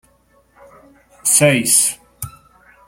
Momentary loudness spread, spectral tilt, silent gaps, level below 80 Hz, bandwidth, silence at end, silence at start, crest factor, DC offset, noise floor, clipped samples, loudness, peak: 21 LU; -2.5 dB/octave; none; -56 dBFS; 16.5 kHz; 0.6 s; 1.25 s; 20 dB; under 0.1%; -56 dBFS; under 0.1%; -13 LUFS; 0 dBFS